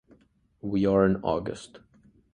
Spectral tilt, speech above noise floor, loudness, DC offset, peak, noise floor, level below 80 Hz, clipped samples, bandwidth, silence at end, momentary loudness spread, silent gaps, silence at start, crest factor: -7.5 dB/octave; 38 dB; -26 LUFS; under 0.1%; -8 dBFS; -63 dBFS; -52 dBFS; under 0.1%; 10 kHz; 0.55 s; 19 LU; none; 0.65 s; 20 dB